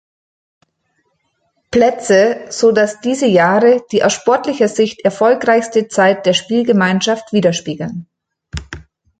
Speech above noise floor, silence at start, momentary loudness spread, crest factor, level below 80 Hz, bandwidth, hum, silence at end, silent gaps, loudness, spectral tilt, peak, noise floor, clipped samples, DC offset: 52 dB; 1.7 s; 14 LU; 14 dB; -44 dBFS; 9.4 kHz; none; 0.4 s; none; -14 LUFS; -4.5 dB/octave; -2 dBFS; -65 dBFS; under 0.1%; under 0.1%